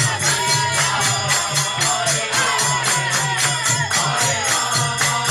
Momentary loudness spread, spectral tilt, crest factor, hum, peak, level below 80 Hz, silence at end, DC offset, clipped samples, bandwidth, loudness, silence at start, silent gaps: 1 LU; -1.5 dB/octave; 12 dB; none; -6 dBFS; -52 dBFS; 0 s; under 0.1%; under 0.1%; 16 kHz; -17 LUFS; 0 s; none